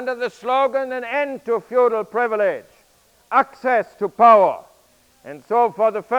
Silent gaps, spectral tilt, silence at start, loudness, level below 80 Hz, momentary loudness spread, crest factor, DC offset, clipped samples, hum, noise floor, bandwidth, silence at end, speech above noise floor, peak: none; -5.5 dB/octave; 0 s; -19 LUFS; -68 dBFS; 12 LU; 18 dB; under 0.1%; under 0.1%; none; -57 dBFS; 13 kHz; 0 s; 38 dB; -2 dBFS